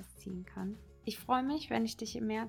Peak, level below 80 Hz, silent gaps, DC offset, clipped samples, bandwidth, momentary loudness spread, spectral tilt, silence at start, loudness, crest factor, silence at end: -18 dBFS; -60 dBFS; none; under 0.1%; under 0.1%; 19 kHz; 12 LU; -5 dB/octave; 0 s; -37 LUFS; 20 dB; 0 s